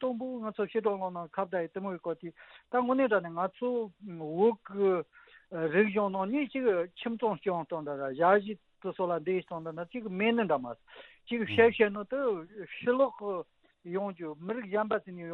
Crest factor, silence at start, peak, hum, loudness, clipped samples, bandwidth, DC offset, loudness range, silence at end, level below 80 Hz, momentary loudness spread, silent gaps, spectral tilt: 22 dB; 0 s; -10 dBFS; none; -31 LUFS; under 0.1%; 4.2 kHz; under 0.1%; 3 LU; 0 s; -76 dBFS; 13 LU; none; -4.5 dB/octave